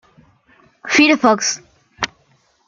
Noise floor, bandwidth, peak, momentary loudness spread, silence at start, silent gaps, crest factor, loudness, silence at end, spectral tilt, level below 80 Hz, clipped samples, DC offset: -58 dBFS; 7.6 kHz; 0 dBFS; 15 LU; 0.85 s; none; 18 dB; -15 LUFS; 0.6 s; -2 dB/octave; -58 dBFS; under 0.1%; under 0.1%